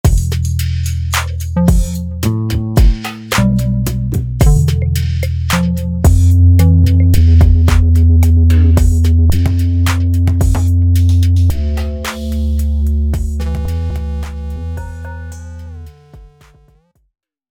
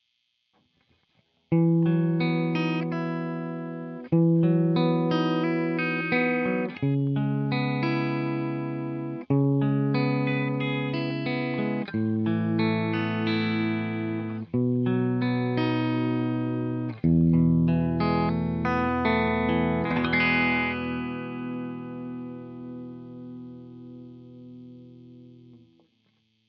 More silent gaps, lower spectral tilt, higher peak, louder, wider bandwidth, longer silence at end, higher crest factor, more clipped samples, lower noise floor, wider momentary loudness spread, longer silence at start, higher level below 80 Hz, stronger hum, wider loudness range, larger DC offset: neither; about the same, -6.5 dB/octave vs -6 dB/octave; first, 0 dBFS vs -10 dBFS; first, -13 LUFS vs -26 LUFS; first, 16.5 kHz vs 5.8 kHz; first, 1.25 s vs 0.9 s; about the same, 12 dB vs 16 dB; neither; second, -53 dBFS vs -74 dBFS; about the same, 14 LU vs 16 LU; second, 0.05 s vs 1.5 s; first, -16 dBFS vs -56 dBFS; neither; about the same, 12 LU vs 12 LU; neither